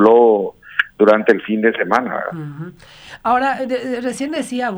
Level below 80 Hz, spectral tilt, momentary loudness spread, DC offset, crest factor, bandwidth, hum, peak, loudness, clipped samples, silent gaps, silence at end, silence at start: -58 dBFS; -5.5 dB/octave; 16 LU; under 0.1%; 16 dB; over 20 kHz; none; 0 dBFS; -17 LUFS; under 0.1%; none; 0 s; 0 s